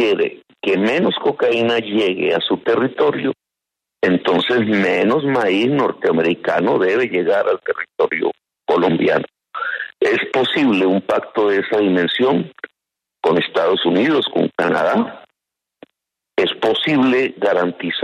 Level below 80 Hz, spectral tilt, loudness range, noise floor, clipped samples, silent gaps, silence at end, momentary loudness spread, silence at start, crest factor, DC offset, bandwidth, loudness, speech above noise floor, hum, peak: -64 dBFS; -6.5 dB/octave; 2 LU; -84 dBFS; under 0.1%; none; 0 s; 8 LU; 0 s; 14 dB; under 0.1%; 10.5 kHz; -17 LUFS; 67 dB; none; -2 dBFS